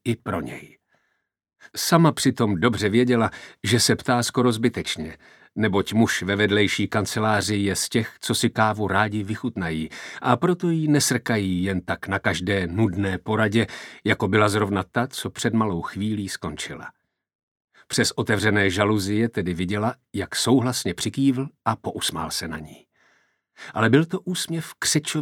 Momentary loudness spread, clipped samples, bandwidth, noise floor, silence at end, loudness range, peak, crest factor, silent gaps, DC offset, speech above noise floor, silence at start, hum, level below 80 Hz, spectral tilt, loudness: 10 LU; under 0.1%; 18 kHz; -74 dBFS; 0 s; 4 LU; -2 dBFS; 22 dB; 17.35-17.56 s, 17.64-17.68 s; under 0.1%; 51 dB; 0.05 s; none; -54 dBFS; -4.5 dB/octave; -23 LUFS